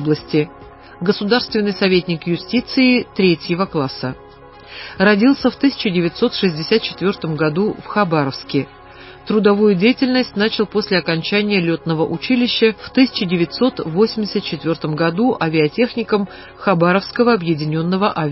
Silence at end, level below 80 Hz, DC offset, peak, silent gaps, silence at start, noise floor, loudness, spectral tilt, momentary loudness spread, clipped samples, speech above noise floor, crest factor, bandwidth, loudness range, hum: 0 s; -50 dBFS; under 0.1%; 0 dBFS; none; 0 s; -40 dBFS; -17 LUFS; -9.5 dB/octave; 7 LU; under 0.1%; 23 dB; 16 dB; 5.8 kHz; 2 LU; none